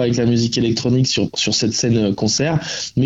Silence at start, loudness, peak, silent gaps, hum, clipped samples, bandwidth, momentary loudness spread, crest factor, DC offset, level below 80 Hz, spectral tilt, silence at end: 0 s; -17 LUFS; -6 dBFS; none; none; under 0.1%; 8 kHz; 2 LU; 10 dB; under 0.1%; -46 dBFS; -4.5 dB/octave; 0 s